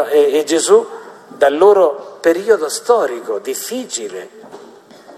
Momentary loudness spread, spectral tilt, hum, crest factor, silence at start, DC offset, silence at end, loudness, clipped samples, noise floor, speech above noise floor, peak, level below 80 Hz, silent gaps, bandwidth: 18 LU; -2.5 dB/octave; none; 14 dB; 0 s; under 0.1%; 0 s; -15 LUFS; under 0.1%; -40 dBFS; 26 dB; 0 dBFS; -64 dBFS; none; 14 kHz